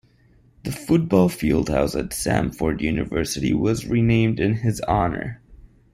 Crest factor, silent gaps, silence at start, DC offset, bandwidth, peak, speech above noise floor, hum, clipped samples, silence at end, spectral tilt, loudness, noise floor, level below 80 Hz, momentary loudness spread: 18 dB; none; 0.65 s; under 0.1%; 16 kHz; -4 dBFS; 35 dB; none; under 0.1%; 0.3 s; -6 dB/octave; -22 LUFS; -56 dBFS; -38 dBFS; 7 LU